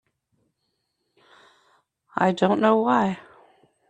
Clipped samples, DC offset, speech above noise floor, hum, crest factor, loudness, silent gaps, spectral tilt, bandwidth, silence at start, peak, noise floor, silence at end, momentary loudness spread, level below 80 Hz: under 0.1%; under 0.1%; 56 dB; none; 22 dB; -22 LUFS; none; -7 dB/octave; 9 kHz; 2.15 s; -4 dBFS; -76 dBFS; 0.7 s; 13 LU; -68 dBFS